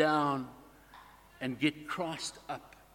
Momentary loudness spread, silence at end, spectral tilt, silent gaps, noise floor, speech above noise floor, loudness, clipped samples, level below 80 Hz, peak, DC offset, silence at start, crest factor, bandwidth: 24 LU; 0.25 s; -4.5 dB/octave; none; -56 dBFS; 23 dB; -35 LUFS; under 0.1%; -66 dBFS; -12 dBFS; under 0.1%; 0 s; 22 dB; 17 kHz